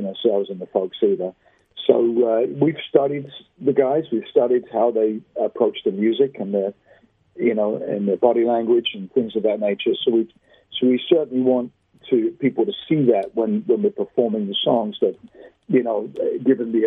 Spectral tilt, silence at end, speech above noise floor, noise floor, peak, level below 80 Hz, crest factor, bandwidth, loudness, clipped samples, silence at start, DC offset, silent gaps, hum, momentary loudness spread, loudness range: -9.5 dB/octave; 0 s; 35 dB; -55 dBFS; 0 dBFS; -68 dBFS; 20 dB; 3.9 kHz; -21 LUFS; under 0.1%; 0 s; under 0.1%; none; none; 7 LU; 1 LU